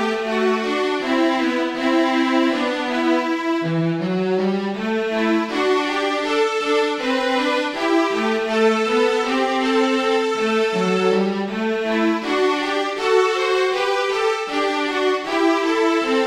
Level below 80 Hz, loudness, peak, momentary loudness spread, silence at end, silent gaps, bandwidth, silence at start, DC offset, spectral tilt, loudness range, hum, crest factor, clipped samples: -58 dBFS; -19 LUFS; -6 dBFS; 3 LU; 0 s; none; 14.5 kHz; 0 s; under 0.1%; -5 dB/octave; 2 LU; none; 14 dB; under 0.1%